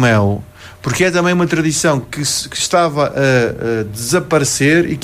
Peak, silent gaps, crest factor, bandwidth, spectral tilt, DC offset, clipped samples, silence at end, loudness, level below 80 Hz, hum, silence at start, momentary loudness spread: -2 dBFS; none; 12 dB; 15.5 kHz; -4.5 dB/octave; under 0.1%; under 0.1%; 0 s; -15 LUFS; -44 dBFS; none; 0 s; 7 LU